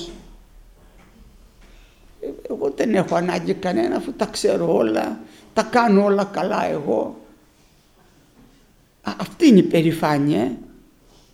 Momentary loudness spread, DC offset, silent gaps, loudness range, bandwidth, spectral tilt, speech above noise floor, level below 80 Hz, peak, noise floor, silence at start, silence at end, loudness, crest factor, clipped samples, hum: 17 LU; under 0.1%; none; 6 LU; 15 kHz; -6.5 dB/octave; 36 dB; -52 dBFS; -2 dBFS; -55 dBFS; 0 s; 0.7 s; -20 LUFS; 20 dB; under 0.1%; none